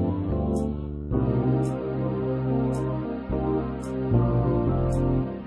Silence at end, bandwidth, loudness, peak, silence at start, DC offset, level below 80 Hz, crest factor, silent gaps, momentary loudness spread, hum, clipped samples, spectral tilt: 0 s; 11 kHz; -26 LUFS; -8 dBFS; 0 s; under 0.1%; -36 dBFS; 16 dB; none; 6 LU; none; under 0.1%; -9.5 dB/octave